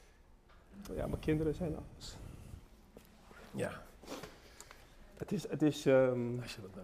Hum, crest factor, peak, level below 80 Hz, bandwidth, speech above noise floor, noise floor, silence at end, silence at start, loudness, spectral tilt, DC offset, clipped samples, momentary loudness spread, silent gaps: none; 20 dB; -18 dBFS; -56 dBFS; 15.5 kHz; 27 dB; -62 dBFS; 0 s; 0.3 s; -36 LUFS; -6.5 dB/octave; under 0.1%; under 0.1%; 25 LU; none